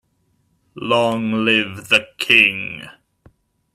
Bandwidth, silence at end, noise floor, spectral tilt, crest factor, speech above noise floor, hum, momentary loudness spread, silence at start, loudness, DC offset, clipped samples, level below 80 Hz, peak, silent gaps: 15 kHz; 0.85 s; -64 dBFS; -4 dB/octave; 20 dB; 47 dB; none; 17 LU; 0.75 s; -16 LUFS; under 0.1%; under 0.1%; -62 dBFS; 0 dBFS; none